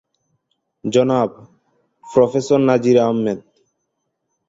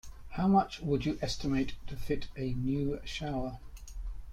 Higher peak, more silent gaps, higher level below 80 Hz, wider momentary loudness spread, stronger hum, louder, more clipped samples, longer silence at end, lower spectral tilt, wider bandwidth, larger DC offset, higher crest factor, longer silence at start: first, -2 dBFS vs -14 dBFS; neither; second, -60 dBFS vs -44 dBFS; second, 10 LU vs 18 LU; neither; first, -17 LUFS vs -33 LUFS; neither; first, 1.1 s vs 0 s; about the same, -6.5 dB/octave vs -6.5 dB/octave; second, 7.8 kHz vs 14.5 kHz; neither; about the same, 18 dB vs 18 dB; first, 0.85 s vs 0.05 s